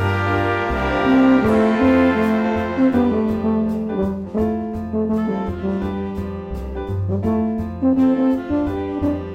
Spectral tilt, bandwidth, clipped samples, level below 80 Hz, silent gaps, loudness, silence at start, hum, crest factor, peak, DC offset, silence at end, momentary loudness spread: -8.5 dB/octave; 8 kHz; under 0.1%; -36 dBFS; none; -19 LUFS; 0 s; none; 14 dB; -4 dBFS; under 0.1%; 0 s; 10 LU